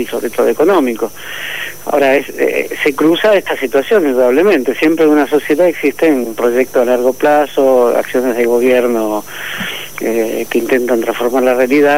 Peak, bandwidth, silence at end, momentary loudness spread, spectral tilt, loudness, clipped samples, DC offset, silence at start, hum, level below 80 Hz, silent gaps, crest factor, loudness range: -2 dBFS; 16.5 kHz; 0 s; 10 LU; -4.5 dB/octave; -13 LUFS; under 0.1%; 2%; 0 s; none; -54 dBFS; none; 12 dB; 3 LU